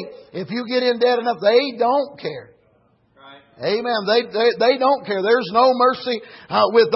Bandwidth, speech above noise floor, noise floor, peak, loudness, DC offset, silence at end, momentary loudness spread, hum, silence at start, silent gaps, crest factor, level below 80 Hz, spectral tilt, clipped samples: 5.8 kHz; 41 dB; -59 dBFS; -4 dBFS; -18 LUFS; under 0.1%; 0 s; 13 LU; none; 0 s; none; 16 dB; -68 dBFS; -8 dB/octave; under 0.1%